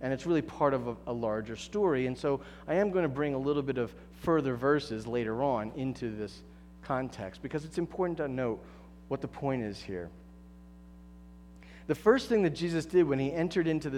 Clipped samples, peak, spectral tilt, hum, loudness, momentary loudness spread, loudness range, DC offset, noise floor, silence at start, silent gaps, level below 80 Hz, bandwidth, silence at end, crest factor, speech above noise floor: under 0.1%; -12 dBFS; -7 dB/octave; 60 Hz at -55 dBFS; -32 LUFS; 12 LU; 6 LU; under 0.1%; -52 dBFS; 0 s; none; -56 dBFS; 13.5 kHz; 0 s; 20 dB; 21 dB